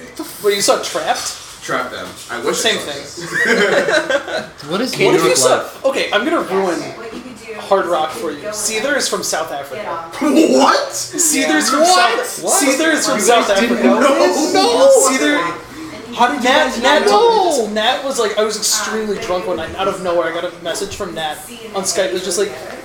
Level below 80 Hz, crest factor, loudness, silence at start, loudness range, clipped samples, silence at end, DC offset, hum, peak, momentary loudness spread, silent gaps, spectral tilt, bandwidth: -50 dBFS; 16 dB; -15 LUFS; 0 s; 6 LU; under 0.1%; 0 s; under 0.1%; none; 0 dBFS; 13 LU; none; -2 dB/octave; 19 kHz